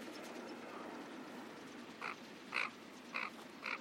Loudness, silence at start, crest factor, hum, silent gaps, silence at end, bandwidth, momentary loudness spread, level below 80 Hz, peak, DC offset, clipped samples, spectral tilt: -46 LUFS; 0 s; 24 dB; none; none; 0 s; 16.5 kHz; 11 LU; -88 dBFS; -22 dBFS; under 0.1%; under 0.1%; -3 dB/octave